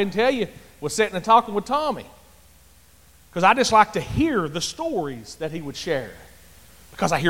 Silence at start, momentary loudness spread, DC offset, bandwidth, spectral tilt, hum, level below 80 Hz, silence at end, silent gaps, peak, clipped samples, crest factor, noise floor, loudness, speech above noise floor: 0 s; 15 LU; 0.3%; 17 kHz; -4 dB/octave; none; -48 dBFS; 0 s; none; -2 dBFS; under 0.1%; 20 dB; -53 dBFS; -22 LUFS; 32 dB